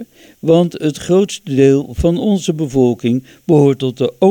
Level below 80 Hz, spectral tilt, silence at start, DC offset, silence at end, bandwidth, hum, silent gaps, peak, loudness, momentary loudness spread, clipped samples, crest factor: -36 dBFS; -7 dB/octave; 0 s; under 0.1%; 0 s; 18.5 kHz; none; none; 0 dBFS; -14 LUFS; 7 LU; under 0.1%; 14 dB